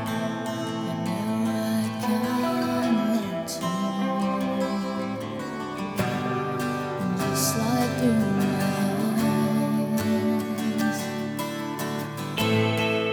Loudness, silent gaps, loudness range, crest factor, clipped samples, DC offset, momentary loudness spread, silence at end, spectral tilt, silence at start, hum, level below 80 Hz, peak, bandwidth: -26 LUFS; none; 4 LU; 14 dB; under 0.1%; under 0.1%; 7 LU; 0 s; -5.5 dB/octave; 0 s; none; -60 dBFS; -10 dBFS; over 20 kHz